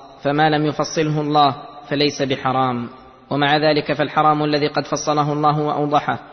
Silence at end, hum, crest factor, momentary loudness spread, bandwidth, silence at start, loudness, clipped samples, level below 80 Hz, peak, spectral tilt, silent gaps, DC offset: 0 s; none; 16 dB; 6 LU; 6.4 kHz; 0 s; -18 LUFS; under 0.1%; -56 dBFS; -2 dBFS; -5 dB/octave; none; under 0.1%